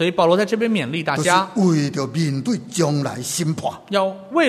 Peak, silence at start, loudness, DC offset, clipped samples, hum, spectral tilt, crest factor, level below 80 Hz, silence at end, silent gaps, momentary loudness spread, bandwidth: -2 dBFS; 0 s; -20 LUFS; under 0.1%; under 0.1%; none; -5 dB/octave; 18 dB; -60 dBFS; 0 s; none; 7 LU; 13.5 kHz